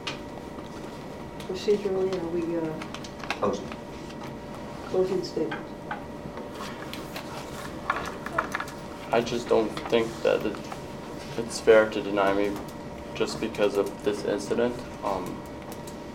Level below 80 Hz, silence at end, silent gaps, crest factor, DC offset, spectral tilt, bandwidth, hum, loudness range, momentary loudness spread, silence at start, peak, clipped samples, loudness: -52 dBFS; 0 s; none; 22 dB; under 0.1%; -5 dB/octave; 16.5 kHz; none; 7 LU; 13 LU; 0 s; -6 dBFS; under 0.1%; -29 LUFS